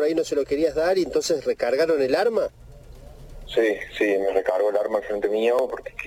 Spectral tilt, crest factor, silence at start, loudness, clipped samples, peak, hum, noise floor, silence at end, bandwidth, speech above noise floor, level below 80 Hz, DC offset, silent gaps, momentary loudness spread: -4 dB/octave; 16 dB; 0 s; -23 LUFS; under 0.1%; -6 dBFS; none; -43 dBFS; 0 s; 16.5 kHz; 20 dB; -48 dBFS; under 0.1%; none; 4 LU